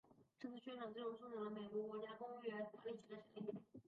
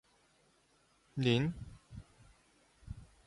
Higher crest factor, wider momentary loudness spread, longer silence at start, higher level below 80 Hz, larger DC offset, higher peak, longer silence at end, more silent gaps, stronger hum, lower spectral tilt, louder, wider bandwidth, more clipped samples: second, 16 dB vs 22 dB; second, 7 LU vs 23 LU; second, 0.05 s vs 1.15 s; second, -90 dBFS vs -58 dBFS; neither; second, -36 dBFS vs -18 dBFS; second, 0.05 s vs 0.25 s; neither; neither; second, -4.5 dB/octave vs -6.5 dB/octave; second, -51 LUFS vs -34 LUFS; second, 7 kHz vs 11.5 kHz; neither